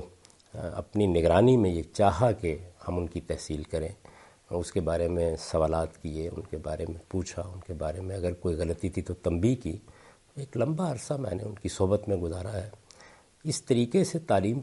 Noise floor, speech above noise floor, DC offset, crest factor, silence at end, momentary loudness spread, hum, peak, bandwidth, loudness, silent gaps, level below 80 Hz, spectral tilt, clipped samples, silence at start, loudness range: -55 dBFS; 27 dB; under 0.1%; 22 dB; 0 s; 13 LU; none; -8 dBFS; 11.5 kHz; -29 LUFS; none; -50 dBFS; -6.5 dB/octave; under 0.1%; 0 s; 6 LU